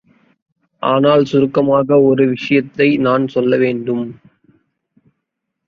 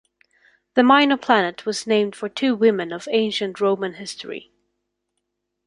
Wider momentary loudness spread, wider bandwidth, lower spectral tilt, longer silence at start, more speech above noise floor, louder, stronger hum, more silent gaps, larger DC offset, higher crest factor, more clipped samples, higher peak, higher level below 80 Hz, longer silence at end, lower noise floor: second, 9 LU vs 16 LU; second, 6.8 kHz vs 11.5 kHz; first, -8 dB/octave vs -4 dB/octave; about the same, 0.8 s vs 0.75 s; first, 62 dB vs 57 dB; first, -14 LUFS vs -20 LUFS; second, none vs 50 Hz at -50 dBFS; neither; neither; second, 14 dB vs 20 dB; neither; about the same, -2 dBFS vs -2 dBFS; first, -58 dBFS vs -68 dBFS; first, 1.55 s vs 1.3 s; about the same, -76 dBFS vs -77 dBFS